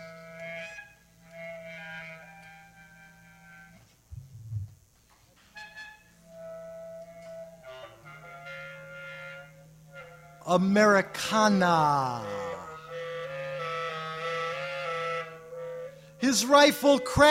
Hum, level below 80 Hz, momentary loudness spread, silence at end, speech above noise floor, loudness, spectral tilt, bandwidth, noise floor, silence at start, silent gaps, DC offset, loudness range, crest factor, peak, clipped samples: none; -60 dBFS; 25 LU; 0 s; 39 dB; -26 LUFS; -4 dB/octave; 16 kHz; -62 dBFS; 0 s; none; under 0.1%; 20 LU; 24 dB; -6 dBFS; under 0.1%